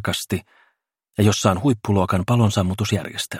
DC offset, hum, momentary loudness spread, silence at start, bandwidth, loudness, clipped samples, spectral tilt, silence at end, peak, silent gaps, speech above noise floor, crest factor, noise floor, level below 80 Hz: under 0.1%; none; 9 LU; 0 s; 16.5 kHz; -20 LUFS; under 0.1%; -5.5 dB/octave; 0 s; -2 dBFS; none; 49 dB; 18 dB; -68 dBFS; -50 dBFS